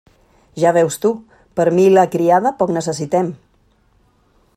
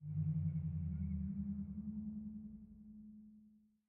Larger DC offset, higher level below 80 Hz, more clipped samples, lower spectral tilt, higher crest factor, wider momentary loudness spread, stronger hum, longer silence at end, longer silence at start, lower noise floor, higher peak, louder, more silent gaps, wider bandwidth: neither; about the same, -58 dBFS vs -60 dBFS; neither; second, -6 dB/octave vs -15 dB/octave; about the same, 18 dB vs 14 dB; second, 13 LU vs 18 LU; neither; first, 1.2 s vs 0.3 s; first, 0.55 s vs 0 s; second, -57 dBFS vs -68 dBFS; first, 0 dBFS vs -30 dBFS; first, -16 LUFS vs -43 LUFS; neither; first, 15 kHz vs 2.4 kHz